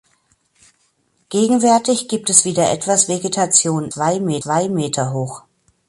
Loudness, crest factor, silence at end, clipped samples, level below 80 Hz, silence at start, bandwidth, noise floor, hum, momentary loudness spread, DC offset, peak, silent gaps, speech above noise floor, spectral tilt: -16 LUFS; 18 dB; 0.5 s; under 0.1%; -60 dBFS; 1.3 s; 12 kHz; -63 dBFS; none; 9 LU; under 0.1%; 0 dBFS; none; 46 dB; -3.5 dB/octave